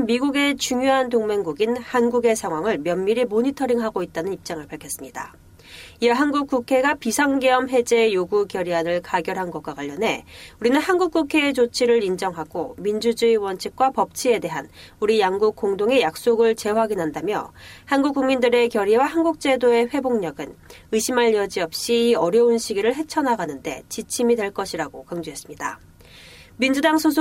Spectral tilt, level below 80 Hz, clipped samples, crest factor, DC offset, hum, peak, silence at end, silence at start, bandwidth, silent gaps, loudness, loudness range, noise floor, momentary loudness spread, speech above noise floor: -4 dB/octave; -56 dBFS; under 0.1%; 16 dB; under 0.1%; none; -6 dBFS; 0 s; 0 s; 16 kHz; none; -21 LUFS; 4 LU; -46 dBFS; 13 LU; 25 dB